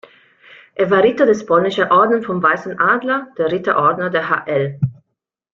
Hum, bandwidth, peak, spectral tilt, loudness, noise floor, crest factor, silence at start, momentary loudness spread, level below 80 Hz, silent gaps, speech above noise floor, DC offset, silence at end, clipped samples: none; 7.4 kHz; -2 dBFS; -6.5 dB/octave; -16 LUFS; -76 dBFS; 16 dB; 0.8 s; 8 LU; -58 dBFS; none; 61 dB; under 0.1%; 0.6 s; under 0.1%